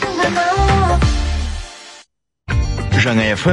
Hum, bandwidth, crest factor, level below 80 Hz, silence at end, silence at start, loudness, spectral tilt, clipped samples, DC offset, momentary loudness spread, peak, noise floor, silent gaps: none; 11 kHz; 14 dB; -22 dBFS; 0 s; 0 s; -16 LUFS; -5.5 dB/octave; under 0.1%; under 0.1%; 13 LU; -2 dBFS; -50 dBFS; none